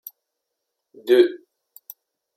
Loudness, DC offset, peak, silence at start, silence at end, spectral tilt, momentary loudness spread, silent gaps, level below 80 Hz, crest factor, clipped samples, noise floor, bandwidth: -18 LUFS; under 0.1%; -4 dBFS; 1.05 s; 1 s; -4 dB/octave; 25 LU; none; -82 dBFS; 20 dB; under 0.1%; -80 dBFS; 16 kHz